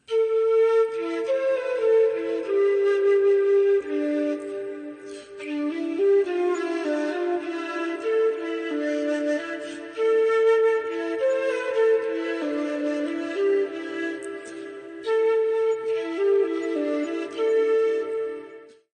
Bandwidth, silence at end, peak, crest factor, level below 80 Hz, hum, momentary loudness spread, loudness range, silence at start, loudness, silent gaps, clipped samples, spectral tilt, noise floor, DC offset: 9.4 kHz; 0.3 s; -12 dBFS; 12 dB; -74 dBFS; none; 13 LU; 4 LU; 0.1 s; -24 LUFS; none; under 0.1%; -4 dB/octave; -45 dBFS; under 0.1%